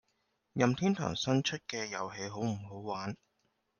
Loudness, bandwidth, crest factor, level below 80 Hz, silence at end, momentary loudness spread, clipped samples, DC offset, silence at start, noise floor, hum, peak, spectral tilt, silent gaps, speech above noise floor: -34 LUFS; 10 kHz; 20 dB; -68 dBFS; 0.65 s; 11 LU; under 0.1%; under 0.1%; 0.55 s; -79 dBFS; none; -14 dBFS; -5 dB/octave; none; 45 dB